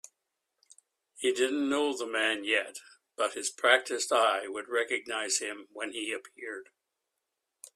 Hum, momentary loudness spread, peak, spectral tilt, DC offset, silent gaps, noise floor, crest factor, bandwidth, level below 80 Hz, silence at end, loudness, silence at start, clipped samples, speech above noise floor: none; 16 LU; -8 dBFS; 0 dB/octave; under 0.1%; none; -85 dBFS; 24 dB; 14.5 kHz; -80 dBFS; 0.05 s; -29 LUFS; 1.15 s; under 0.1%; 55 dB